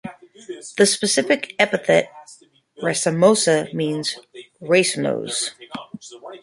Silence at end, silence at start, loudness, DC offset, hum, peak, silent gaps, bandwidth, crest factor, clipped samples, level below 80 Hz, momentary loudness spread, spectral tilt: 0.05 s; 0.05 s; -19 LUFS; under 0.1%; none; -2 dBFS; none; 11.5 kHz; 20 dB; under 0.1%; -66 dBFS; 20 LU; -3.5 dB/octave